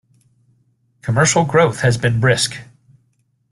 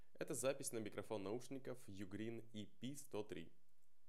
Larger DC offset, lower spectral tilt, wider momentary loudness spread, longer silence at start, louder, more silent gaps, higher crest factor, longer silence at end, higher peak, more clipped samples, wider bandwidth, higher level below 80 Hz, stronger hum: second, under 0.1% vs 0.2%; about the same, -4.5 dB/octave vs -4.5 dB/octave; about the same, 9 LU vs 11 LU; first, 1.05 s vs 0.2 s; first, -16 LUFS vs -49 LUFS; neither; about the same, 18 dB vs 20 dB; first, 0.9 s vs 0.6 s; first, -2 dBFS vs -30 dBFS; neither; second, 12.5 kHz vs 16 kHz; first, -48 dBFS vs -88 dBFS; neither